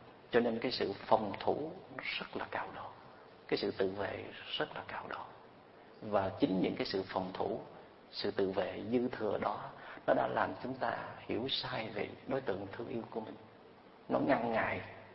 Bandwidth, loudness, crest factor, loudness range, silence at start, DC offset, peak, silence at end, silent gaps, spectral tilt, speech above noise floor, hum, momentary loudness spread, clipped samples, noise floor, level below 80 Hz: 5.8 kHz; -37 LUFS; 24 dB; 4 LU; 0 s; under 0.1%; -12 dBFS; 0 s; none; -3.5 dB/octave; 22 dB; none; 14 LU; under 0.1%; -58 dBFS; -68 dBFS